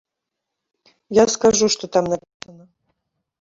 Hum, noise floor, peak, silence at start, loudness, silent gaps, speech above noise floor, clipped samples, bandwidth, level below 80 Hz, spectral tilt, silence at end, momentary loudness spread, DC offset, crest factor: none; -82 dBFS; -2 dBFS; 1.1 s; -18 LUFS; 2.34-2.40 s; 63 dB; under 0.1%; 7.8 kHz; -54 dBFS; -3.5 dB/octave; 0.9 s; 9 LU; under 0.1%; 20 dB